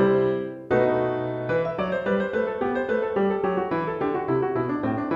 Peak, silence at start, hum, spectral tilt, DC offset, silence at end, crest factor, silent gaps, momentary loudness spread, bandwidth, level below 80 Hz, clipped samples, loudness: -10 dBFS; 0 s; none; -9 dB/octave; under 0.1%; 0 s; 14 dB; none; 4 LU; 6.6 kHz; -54 dBFS; under 0.1%; -25 LUFS